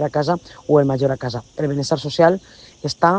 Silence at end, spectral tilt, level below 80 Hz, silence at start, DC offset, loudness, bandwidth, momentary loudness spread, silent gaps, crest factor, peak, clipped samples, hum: 0 s; -6 dB/octave; -52 dBFS; 0 s; under 0.1%; -19 LUFS; 9.4 kHz; 11 LU; none; 18 dB; 0 dBFS; under 0.1%; none